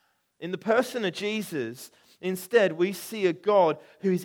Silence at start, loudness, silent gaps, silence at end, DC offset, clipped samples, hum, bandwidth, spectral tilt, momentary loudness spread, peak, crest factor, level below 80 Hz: 0.4 s; -27 LUFS; none; 0 s; under 0.1%; under 0.1%; none; 19 kHz; -5 dB/octave; 14 LU; -8 dBFS; 18 dB; -78 dBFS